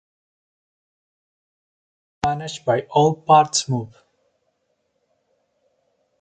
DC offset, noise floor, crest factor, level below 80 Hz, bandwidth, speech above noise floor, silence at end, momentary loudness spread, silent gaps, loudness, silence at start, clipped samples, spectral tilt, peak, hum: under 0.1%; -71 dBFS; 22 dB; -56 dBFS; 9.6 kHz; 52 dB; 2.35 s; 11 LU; none; -19 LUFS; 2.25 s; under 0.1%; -4.5 dB/octave; -2 dBFS; none